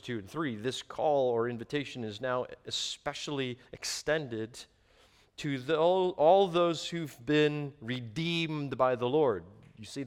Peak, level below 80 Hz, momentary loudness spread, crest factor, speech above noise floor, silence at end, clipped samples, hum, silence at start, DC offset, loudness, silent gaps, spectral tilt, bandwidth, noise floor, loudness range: -12 dBFS; -66 dBFS; 12 LU; 20 dB; 33 dB; 0 s; under 0.1%; none; 0.05 s; under 0.1%; -31 LUFS; none; -5 dB/octave; 16 kHz; -63 dBFS; 7 LU